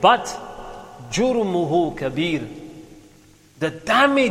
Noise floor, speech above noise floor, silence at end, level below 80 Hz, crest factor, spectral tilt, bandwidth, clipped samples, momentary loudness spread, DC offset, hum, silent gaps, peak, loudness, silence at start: -51 dBFS; 32 dB; 0 s; -50 dBFS; 20 dB; -4.5 dB/octave; 16 kHz; under 0.1%; 21 LU; under 0.1%; none; none; -2 dBFS; -21 LUFS; 0 s